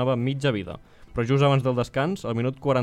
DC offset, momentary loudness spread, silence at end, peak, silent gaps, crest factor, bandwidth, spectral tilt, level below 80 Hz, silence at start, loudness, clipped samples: under 0.1%; 13 LU; 0 s; -6 dBFS; none; 18 dB; 10 kHz; -7 dB/octave; -50 dBFS; 0 s; -24 LUFS; under 0.1%